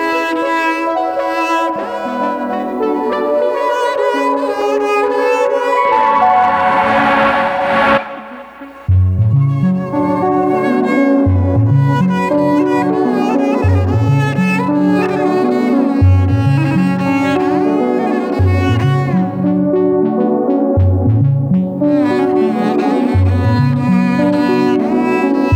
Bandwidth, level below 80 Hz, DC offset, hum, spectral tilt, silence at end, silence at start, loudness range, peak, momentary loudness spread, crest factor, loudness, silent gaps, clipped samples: 9.4 kHz; -38 dBFS; under 0.1%; none; -8 dB/octave; 0 s; 0 s; 3 LU; -2 dBFS; 4 LU; 12 dB; -13 LUFS; none; under 0.1%